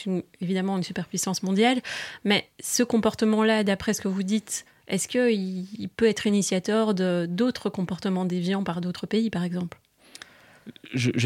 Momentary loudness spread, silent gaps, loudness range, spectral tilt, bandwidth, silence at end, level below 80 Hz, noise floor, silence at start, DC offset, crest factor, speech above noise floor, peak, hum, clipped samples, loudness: 11 LU; none; 4 LU; -4.5 dB/octave; 16 kHz; 0 s; -64 dBFS; -49 dBFS; 0 s; under 0.1%; 16 dB; 23 dB; -10 dBFS; none; under 0.1%; -26 LUFS